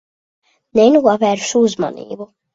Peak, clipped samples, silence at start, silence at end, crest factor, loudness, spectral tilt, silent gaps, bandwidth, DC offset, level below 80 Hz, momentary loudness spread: 0 dBFS; under 0.1%; 0.75 s; 0.3 s; 16 dB; -14 LUFS; -4.5 dB/octave; none; 7.8 kHz; under 0.1%; -60 dBFS; 19 LU